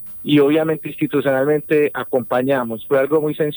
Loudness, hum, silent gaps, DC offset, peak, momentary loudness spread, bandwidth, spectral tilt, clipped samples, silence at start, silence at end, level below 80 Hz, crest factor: -18 LUFS; none; none; under 0.1%; -4 dBFS; 6 LU; over 20 kHz; -8.5 dB/octave; under 0.1%; 0 s; 0 s; -60 dBFS; 14 dB